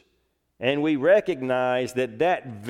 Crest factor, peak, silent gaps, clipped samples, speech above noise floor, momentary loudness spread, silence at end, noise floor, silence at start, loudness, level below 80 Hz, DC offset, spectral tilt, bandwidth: 18 dB; -6 dBFS; none; under 0.1%; 48 dB; 7 LU; 0 s; -71 dBFS; 0.6 s; -23 LUFS; -66 dBFS; under 0.1%; -6 dB/octave; 14 kHz